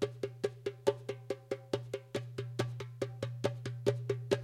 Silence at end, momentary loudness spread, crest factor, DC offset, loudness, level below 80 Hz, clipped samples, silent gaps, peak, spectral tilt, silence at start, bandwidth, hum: 0 s; 6 LU; 24 dB; under 0.1%; -38 LUFS; -70 dBFS; under 0.1%; none; -14 dBFS; -6 dB/octave; 0 s; 13.5 kHz; none